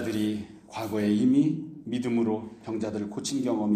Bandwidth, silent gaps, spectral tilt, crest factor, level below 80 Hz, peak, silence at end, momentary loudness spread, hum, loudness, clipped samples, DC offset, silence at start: 15.5 kHz; none; -6 dB/octave; 14 dB; -66 dBFS; -12 dBFS; 0 s; 13 LU; none; -28 LUFS; under 0.1%; under 0.1%; 0 s